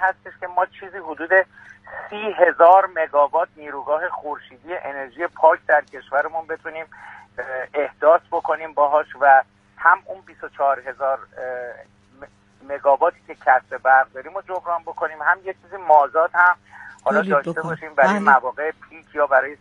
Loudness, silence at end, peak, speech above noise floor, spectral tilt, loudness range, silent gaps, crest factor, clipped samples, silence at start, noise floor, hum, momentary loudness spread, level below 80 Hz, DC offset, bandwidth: -19 LUFS; 0.05 s; 0 dBFS; 26 dB; -6 dB/octave; 4 LU; none; 20 dB; under 0.1%; 0 s; -46 dBFS; none; 17 LU; -66 dBFS; under 0.1%; 9.8 kHz